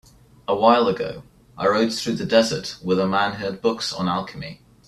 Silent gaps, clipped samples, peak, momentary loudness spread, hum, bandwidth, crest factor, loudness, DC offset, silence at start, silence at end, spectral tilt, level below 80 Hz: none; under 0.1%; -2 dBFS; 16 LU; none; 13 kHz; 20 dB; -21 LUFS; under 0.1%; 0.5 s; 0.3 s; -5 dB/octave; -56 dBFS